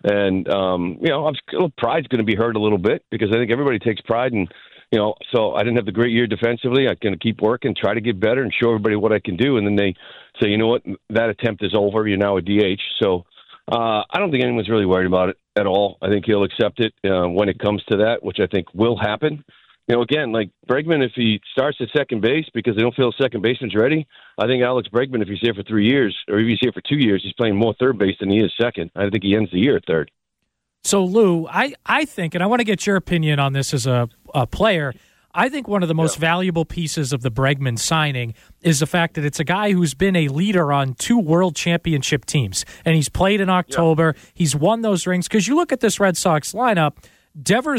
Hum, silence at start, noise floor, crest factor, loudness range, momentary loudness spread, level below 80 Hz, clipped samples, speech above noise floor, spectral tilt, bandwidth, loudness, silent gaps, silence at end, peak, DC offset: none; 0.05 s; -76 dBFS; 14 dB; 2 LU; 5 LU; -48 dBFS; under 0.1%; 58 dB; -5.5 dB/octave; 16 kHz; -19 LUFS; none; 0 s; -4 dBFS; under 0.1%